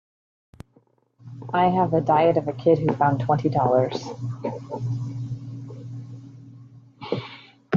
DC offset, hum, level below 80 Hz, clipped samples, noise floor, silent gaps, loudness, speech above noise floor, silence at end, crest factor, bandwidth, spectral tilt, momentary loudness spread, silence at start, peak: under 0.1%; none; -60 dBFS; under 0.1%; -61 dBFS; none; -23 LUFS; 40 dB; 0 s; 18 dB; 7.4 kHz; -8 dB/octave; 21 LU; 1.25 s; -6 dBFS